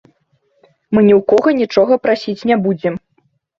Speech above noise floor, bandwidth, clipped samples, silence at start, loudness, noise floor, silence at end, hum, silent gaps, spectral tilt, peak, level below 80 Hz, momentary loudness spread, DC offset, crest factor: 49 dB; 7.4 kHz; under 0.1%; 0.9 s; -14 LUFS; -61 dBFS; 0.65 s; none; none; -7.5 dB/octave; 0 dBFS; -54 dBFS; 9 LU; under 0.1%; 14 dB